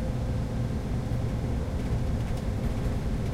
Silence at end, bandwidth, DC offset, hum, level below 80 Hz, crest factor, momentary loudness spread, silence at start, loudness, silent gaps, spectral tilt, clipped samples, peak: 0 s; 14.5 kHz; under 0.1%; none; -32 dBFS; 12 dB; 1 LU; 0 s; -31 LUFS; none; -7.5 dB/octave; under 0.1%; -16 dBFS